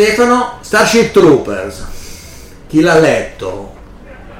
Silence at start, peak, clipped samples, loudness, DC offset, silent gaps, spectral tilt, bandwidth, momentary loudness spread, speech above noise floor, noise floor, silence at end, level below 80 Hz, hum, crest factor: 0 s; 0 dBFS; under 0.1%; -11 LUFS; under 0.1%; none; -4.5 dB/octave; 16.5 kHz; 21 LU; 23 dB; -33 dBFS; 0 s; -34 dBFS; none; 12 dB